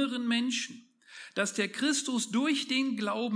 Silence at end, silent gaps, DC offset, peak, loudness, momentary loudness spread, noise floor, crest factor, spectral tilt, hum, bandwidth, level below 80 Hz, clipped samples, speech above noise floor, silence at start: 0 s; none; under 0.1%; -14 dBFS; -30 LUFS; 7 LU; -51 dBFS; 18 dB; -2.5 dB/octave; none; 10.5 kHz; -88 dBFS; under 0.1%; 21 dB; 0 s